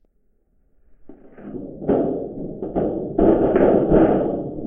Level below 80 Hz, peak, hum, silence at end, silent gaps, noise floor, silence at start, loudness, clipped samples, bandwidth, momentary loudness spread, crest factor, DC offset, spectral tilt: -38 dBFS; -2 dBFS; none; 0 s; none; -62 dBFS; 1.05 s; -19 LUFS; under 0.1%; 3.6 kHz; 18 LU; 18 dB; under 0.1%; -12 dB/octave